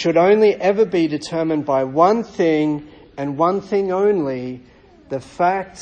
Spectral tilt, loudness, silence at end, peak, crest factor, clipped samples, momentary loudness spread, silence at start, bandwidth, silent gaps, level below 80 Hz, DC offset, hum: -6.5 dB/octave; -18 LUFS; 0 s; -2 dBFS; 16 dB; under 0.1%; 15 LU; 0 s; 9 kHz; none; -56 dBFS; under 0.1%; none